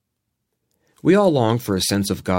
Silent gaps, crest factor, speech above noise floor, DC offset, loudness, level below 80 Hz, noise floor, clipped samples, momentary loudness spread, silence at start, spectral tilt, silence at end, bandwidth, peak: none; 16 dB; 59 dB; under 0.1%; -18 LUFS; -52 dBFS; -77 dBFS; under 0.1%; 6 LU; 1.05 s; -5.5 dB/octave; 0 s; 17 kHz; -4 dBFS